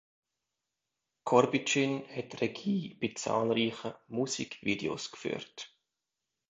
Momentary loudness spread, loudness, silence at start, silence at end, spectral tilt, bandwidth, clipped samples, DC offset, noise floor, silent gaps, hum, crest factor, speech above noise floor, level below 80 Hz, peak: 14 LU; -32 LUFS; 1.25 s; 0.85 s; -4.5 dB/octave; 9 kHz; under 0.1%; under 0.1%; -88 dBFS; none; none; 26 dB; 56 dB; -72 dBFS; -8 dBFS